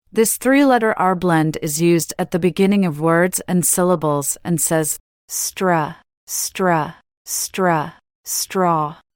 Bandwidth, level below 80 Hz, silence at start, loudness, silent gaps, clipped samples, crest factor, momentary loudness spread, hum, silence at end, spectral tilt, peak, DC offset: 18 kHz; -54 dBFS; 0.15 s; -18 LUFS; 5.00-5.28 s, 6.17-6.27 s, 7.17-7.25 s, 8.15-8.24 s; under 0.1%; 16 dB; 8 LU; none; 0.2 s; -4.5 dB/octave; -4 dBFS; under 0.1%